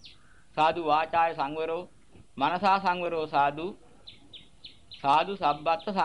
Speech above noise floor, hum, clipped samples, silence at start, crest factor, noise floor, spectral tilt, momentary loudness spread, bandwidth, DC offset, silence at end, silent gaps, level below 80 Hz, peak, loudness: 30 dB; none; under 0.1%; 0.05 s; 18 dB; -57 dBFS; -5.5 dB/octave; 22 LU; 11 kHz; 0.2%; 0 s; none; -62 dBFS; -12 dBFS; -27 LUFS